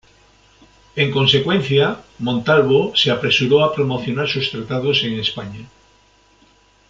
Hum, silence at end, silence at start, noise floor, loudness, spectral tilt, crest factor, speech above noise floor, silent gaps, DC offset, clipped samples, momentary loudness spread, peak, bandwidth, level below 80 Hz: none; 1.25 s; 0.95 s; -54 dBFS; -17 LUFS; -5.5 dB/octave; 18 dB; 37 dB; none; under 0.1%; under 0.1%; 9 LU; -2 dBFS; 7.6 kHz; -52 dBFS